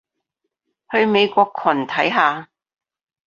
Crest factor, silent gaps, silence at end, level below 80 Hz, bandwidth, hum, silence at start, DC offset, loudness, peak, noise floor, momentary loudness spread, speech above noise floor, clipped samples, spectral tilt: 18 dB; none; 0.85 s; -66 dBFS; 7.2 kHz; none; 0.9 s; under 0.1%; -18 LUFS; -2 dBFS; -78 dBFS; 5 LU; 60 dB; under 0.1%; -5.5 dB/octave